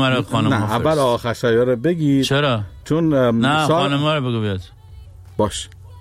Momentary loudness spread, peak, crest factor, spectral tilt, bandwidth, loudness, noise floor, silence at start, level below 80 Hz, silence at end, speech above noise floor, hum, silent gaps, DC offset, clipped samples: 8 LU; -8 dBFS; 10 dB; -6 dB/octave; 15.5 kHz; -18 LUFS; -40 dBFS; 0 s; -44 dBFS; 0 s; 22 dB; none; none; under 0.1%; under 0.1%